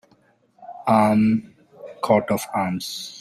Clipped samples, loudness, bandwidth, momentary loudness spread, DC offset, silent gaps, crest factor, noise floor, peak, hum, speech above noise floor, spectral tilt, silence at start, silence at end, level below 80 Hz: under 0.1%; -21 LUFS; 15 kHz; 14 LU; under 0.1%; none; 18 dB; -60 dBFS; -4 dBFS; none; 40 dB; -6 dB/octave; 0.6 s; 0 s; -60 dBFS